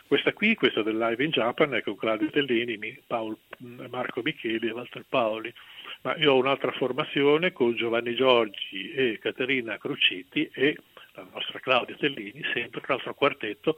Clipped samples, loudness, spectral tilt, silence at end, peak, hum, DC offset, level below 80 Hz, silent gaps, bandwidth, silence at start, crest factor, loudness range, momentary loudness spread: under 0.1%; -26 LUFS; -6.5 dB/octave; 0 s; -6 dBFS; none; under 0.1%; -72 dBFS; none; 16.5 kHz; 0.1 s; 22 dB; 5 LU; 13 LU